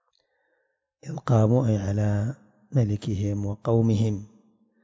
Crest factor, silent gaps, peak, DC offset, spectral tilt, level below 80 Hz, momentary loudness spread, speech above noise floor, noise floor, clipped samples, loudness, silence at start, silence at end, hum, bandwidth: 16 dB; none; -10 dBFS; under 0.1%; -8.5 dB/octave; -48 dBFS; 14 LU; 51 dB; -74 dBFS; under 0.1%; -25 LUFS; 1.05 s; 0.6 s; none; 7.6 kHz